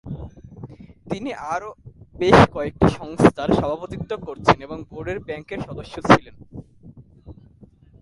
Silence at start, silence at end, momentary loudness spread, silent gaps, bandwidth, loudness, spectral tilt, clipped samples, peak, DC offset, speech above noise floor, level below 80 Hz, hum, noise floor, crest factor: 0.05 s; 0.7 s; 25 LU; none; 11.5 kHz; -20 LUFS; -6.5 dB/octave; under 0.1%; 0 dBFS; under 0.1%; 30 dB; -40 dBFS; none; -50 dBFS; 22 dB